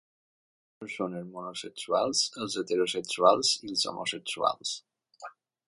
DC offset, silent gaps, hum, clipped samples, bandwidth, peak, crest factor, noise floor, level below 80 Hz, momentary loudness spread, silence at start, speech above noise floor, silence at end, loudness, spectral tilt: under 0.1%; none; none; under 0.1%; 11.5 kHz; -6 dBFS; 24 dB; -49 dBFS; -76 dBFS; 19 LU; 0.8 s; 19 dB; 0.4 s; -29 LUFS; -2 dB/octave